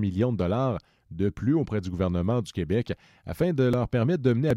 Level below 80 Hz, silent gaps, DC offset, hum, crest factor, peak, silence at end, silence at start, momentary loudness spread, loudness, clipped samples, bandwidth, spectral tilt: -48 dBFS; none; under 0.1%; none; 16 dB; -10 dBFS; 0 s; 0 s; 11 LU; -27 LUFS; under 0.1%; 14 kHz; -8.5 dB/octave